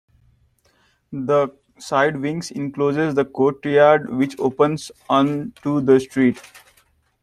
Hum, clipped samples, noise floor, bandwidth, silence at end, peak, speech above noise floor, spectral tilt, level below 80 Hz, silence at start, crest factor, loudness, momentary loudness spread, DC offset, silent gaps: none; under 0.1%; -61 dBFS; 13 kHz; 0.65 s; -2 dBFS; 42 dB; -6.5 dB/octave; -60 dBFS; 1.1 s; 18 dB; -19 LUFS; 12 LU; under 0.1%; none